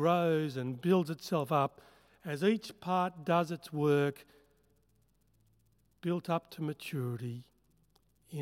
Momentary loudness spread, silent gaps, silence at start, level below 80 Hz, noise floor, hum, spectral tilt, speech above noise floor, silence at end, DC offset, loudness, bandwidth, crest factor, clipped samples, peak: 12 LU; none; 0 s; -76 dBFS; -72 dBFS; none; -7 dB/octave; 40 dB; 0 s; under 0.1%; -33 LUFS; 16.5 kHz; 18 dB; under 0.1%; -16 dBFS